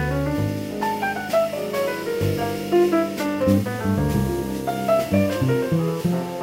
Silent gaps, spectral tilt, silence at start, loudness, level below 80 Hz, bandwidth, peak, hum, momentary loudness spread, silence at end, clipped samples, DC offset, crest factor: none; -6.5 dB/octave; 0 s; -22 LUFS; -40 dBFS; 16 kHz; -6 dBFS; none; 5 LU; 0 s; under 0.1%; under 0.1%; 16 dB